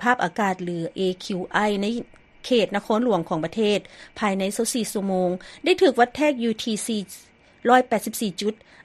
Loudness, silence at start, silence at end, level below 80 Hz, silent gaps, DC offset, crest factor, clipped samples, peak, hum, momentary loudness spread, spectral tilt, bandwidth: -23 LUFS; 0 s; 0.3 s; -58 dBFS; none; under 0.1%; 20 dB; under 0.1%; -4 dBFS; none; 10 LU; -4.5 dB/octave; 13 kHz